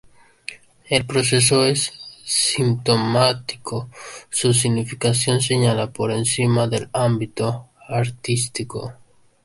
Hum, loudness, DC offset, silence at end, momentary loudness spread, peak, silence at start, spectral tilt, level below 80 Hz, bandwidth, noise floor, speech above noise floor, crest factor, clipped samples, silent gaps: none; -20 LUFS; under 0.1%; 0.5 s; 16 LU; -2 dBFS; 0.5 s; -4 dB/octave; -54 dBFS; 11.5 kHz; -39 dBFS; 20 dB; 18 dB; under 0.1%; none